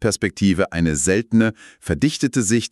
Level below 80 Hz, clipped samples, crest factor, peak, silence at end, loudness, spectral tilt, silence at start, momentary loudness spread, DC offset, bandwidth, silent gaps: -40 dBFS; under 0.1%; 16 dB; -4 dBFS; 0.05 s; -19 LUFS; -5 dB/octave; 0 s; 5 LU; under 0.1%; 13 kHz; none